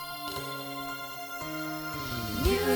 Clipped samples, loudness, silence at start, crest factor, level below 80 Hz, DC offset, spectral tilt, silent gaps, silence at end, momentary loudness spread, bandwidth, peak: under 0.1%; -34 LUFS; 0 s; 20 dB; -42 dBFS; under 0.1%; -4.5 dB/octave; none; 0 s; 8 LU; over 20 kHz; -12 dBFS